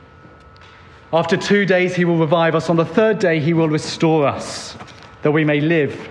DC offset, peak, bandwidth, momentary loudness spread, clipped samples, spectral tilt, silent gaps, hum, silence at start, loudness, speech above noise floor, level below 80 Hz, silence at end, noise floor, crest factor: under 0.1%; -2 dBFS; 11 kHz; 8 LU; under 0.1%; -6 dB/octave; none; none; 1.1 s; -17 LUFS; 27 dB; -54 dBFS; 0 s; -43 dBFS; 14 dB